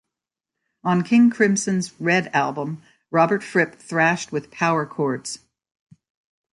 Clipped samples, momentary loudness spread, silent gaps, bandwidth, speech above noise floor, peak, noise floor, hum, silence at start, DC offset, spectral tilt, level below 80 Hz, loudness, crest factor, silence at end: under 0.1%; 13 LU; none; 11.5 kHz; 66 dB; -4 dBFS; -86 dBFS; none; 0.85 s; under 0.1%; -5 dB/octave; -66 dBFS; -21 LUFS; 18 dB; 1.2 s